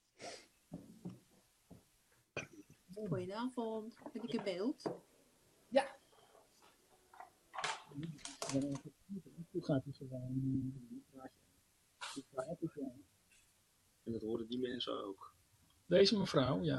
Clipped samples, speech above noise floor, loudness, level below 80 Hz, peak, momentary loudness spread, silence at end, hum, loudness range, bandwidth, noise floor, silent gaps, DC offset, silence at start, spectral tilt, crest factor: under 0.1%; 35 dB; -40 LUFS; -72 dBFS; -18 dBFS; 20 LU; 0 s; none; 7 LU; 13 kHz; -74 dBFS; none; under 0.1%; 0.2 s; -5.5 dB/octave; 24 dB